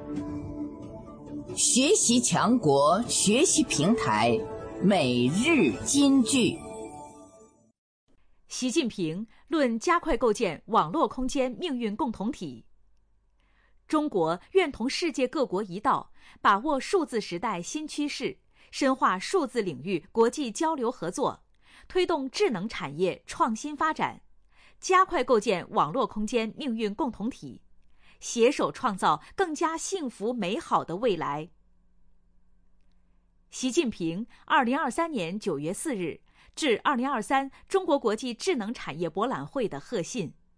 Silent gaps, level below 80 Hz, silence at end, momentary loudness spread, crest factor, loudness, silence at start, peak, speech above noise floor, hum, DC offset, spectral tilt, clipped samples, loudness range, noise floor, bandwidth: 7.78-8.07 s; -54 dBFS; 0.25 s; 13 LU; 18 dB; -27 LUFS; 0 s; -10 dBFS; 38 dB; none; under 0.1%; -3.5 dB/octave; under 0.1%; 7 LU; -65 dBFS; 10.5 kHz